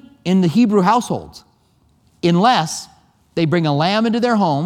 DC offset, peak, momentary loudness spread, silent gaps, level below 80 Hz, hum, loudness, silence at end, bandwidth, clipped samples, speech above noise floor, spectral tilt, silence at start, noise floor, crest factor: under 0.1%; 0 dBFS; 11 LU; none; -56 dBFS; none; -16 LUFS; 0 s; 14.5 kHz; under 0.1%; 42 dB; -6 dB/octave; 0.25 s; -57 dBFS; 16 dB